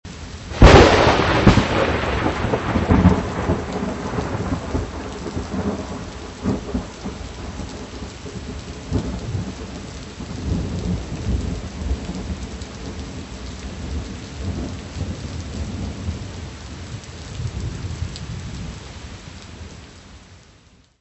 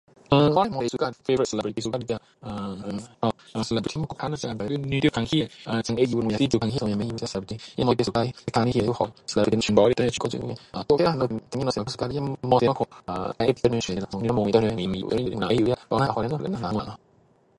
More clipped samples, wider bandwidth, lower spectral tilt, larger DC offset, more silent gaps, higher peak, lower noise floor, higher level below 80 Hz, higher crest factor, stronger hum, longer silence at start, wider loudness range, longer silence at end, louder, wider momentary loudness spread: neither; second, 8.4 kHz vs 11.5 kHz; about the same, -6 dB/octave vs -6 dB/octave; neither; neither; first, 0 dBFS vs -4 dBFS; second, -52 dBFS vs -60 dBFS; first, -28 dBFS vs -50 dBFS; about the same, 22 dB vs 22 dB; neither; second, 0.05 s vs 0.3 s; first, 14 LU vs 5 LU; about the same, 0.65 s vs 0.6 s; first, -21 LUFS vs -25 LUFS; first, 19 LU vs 10 LU